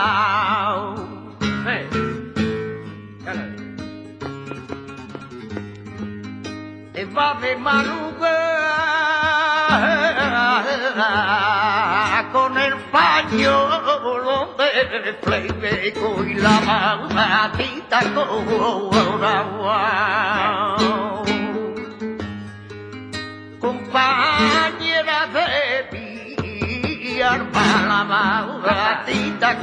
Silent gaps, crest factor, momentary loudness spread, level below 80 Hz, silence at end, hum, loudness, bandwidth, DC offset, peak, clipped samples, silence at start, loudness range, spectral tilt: none; 20 dB; 16 LU; -50 dBFS; 0 s; none; -19 LUFS; 10.5 kHz; under 0.1%; 0 dBFS; under 0.1%; 0 s; 10 LU; -4.5 dB/octave